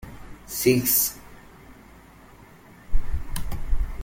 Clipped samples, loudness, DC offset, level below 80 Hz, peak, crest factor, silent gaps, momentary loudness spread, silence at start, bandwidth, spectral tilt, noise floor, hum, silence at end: under 0.1%; -24 LUFS; under 0.1%; -32 dBFS; -6 dBFS; 18 dB; none; 23 LU; 0.05 s; 17 kHz; -4 dB/octave; -49 dBFS; none; 0 s